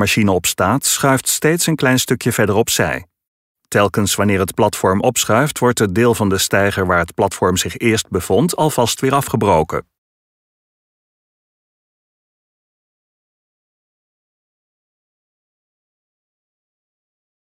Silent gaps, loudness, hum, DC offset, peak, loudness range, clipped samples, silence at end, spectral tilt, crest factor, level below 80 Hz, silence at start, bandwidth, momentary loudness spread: 3.27-3.55 s; -15 LUFS; none; under 0.1%; -2 dBFS; 5 LU; under 0.1%; 7.65 s; -4 dB/octave; 16 dB; -46 dBFS; 0 s; 16.5 kHz; 3 LU